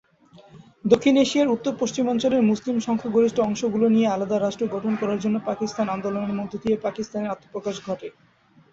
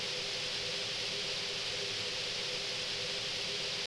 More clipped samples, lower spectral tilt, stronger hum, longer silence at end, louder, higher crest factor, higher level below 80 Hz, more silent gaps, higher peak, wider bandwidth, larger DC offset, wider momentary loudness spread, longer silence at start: neither; first, -5.5 dB/octave vs -1 dB/octave; neither; first, 0.65 s vs 0 s; first, -23 LUFS vs -34 LUFS; first, 20 dB vs 14 dB; about the same, -62 dBFS vs -64 dBFS; neither; first, -4 dBFS vs -24 dBFS; second, 7.8 kHz vs 11 kHz; neither; first, 11 LU vs 0 LU; first, 0.55 s vs 0 s